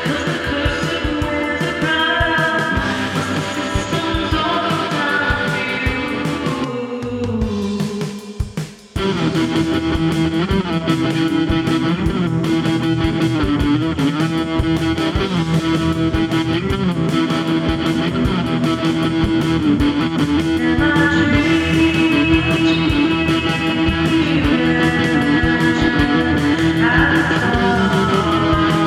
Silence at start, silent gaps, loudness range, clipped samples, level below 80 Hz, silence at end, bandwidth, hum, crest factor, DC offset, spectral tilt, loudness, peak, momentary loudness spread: 0 s; none; 5 LU; under 0.1%; -32 dBFS; 0 s; 13.5 kHz; none; 14 dB; under 0.1%; -6 dB/octave; -17 LUFS; -2 dBFS; 6 LU